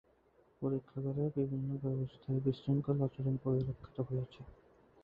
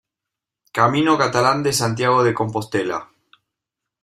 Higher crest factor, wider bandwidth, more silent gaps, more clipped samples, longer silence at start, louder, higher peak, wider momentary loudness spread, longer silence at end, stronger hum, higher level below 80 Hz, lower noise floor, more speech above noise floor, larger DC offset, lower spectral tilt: about the same, 16 dB vs 18 dB; second, 5 kHz vs 15.5 kHz; neither; neither; second, 0.6 s vs 0.75 s; second, -37 LUFS vs -18 LUFS; second, -20 dBFS vs -2 dBFS; about the same, 7 LU vs 9 LU; second, 0.5 s vs 1 s; neither; about the same, -62 dBFS vs -58 dBFS; second, -69 dBFS vs -85 dBFS; second, 33 dB vs 67 dB; neither; first, -10.5 dB/octave vs -4.5 dB/octave